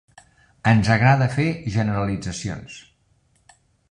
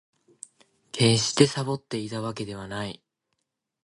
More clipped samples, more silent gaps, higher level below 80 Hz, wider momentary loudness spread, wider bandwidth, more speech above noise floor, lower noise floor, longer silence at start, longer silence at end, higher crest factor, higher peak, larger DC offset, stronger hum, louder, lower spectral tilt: neither; neither; first, -46 dBFS vs -60 dBFS; second, 17 LU vs 25 LU; about the same, 10.5 kHz vs 11.5 kHz; second, 43 dB vs 55 dB; second, -63 dBFS vs -80 dBFS; second, 0.65 s vs 0.95 s; first, 1.1 s vs 0.9 s; second, 20 dB vs 26 dB; about the same, -2 dBFS vs -2 dBFS; neither; neither; first, -21 LUFS vs -25 LUFS; first, -6.5 dB/octave vs -4.5 dB/octave